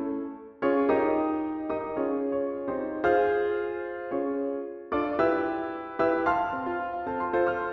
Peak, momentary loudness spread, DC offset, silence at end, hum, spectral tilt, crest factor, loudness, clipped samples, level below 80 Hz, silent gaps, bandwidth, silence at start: -12 dBFS; 9 LU; under 0.1%; 0 s; none; -8 dB/octave; 16 dB; -28 LUFS; under 0.1%; -58 dBFS; none; 6.2 kHz; 0 s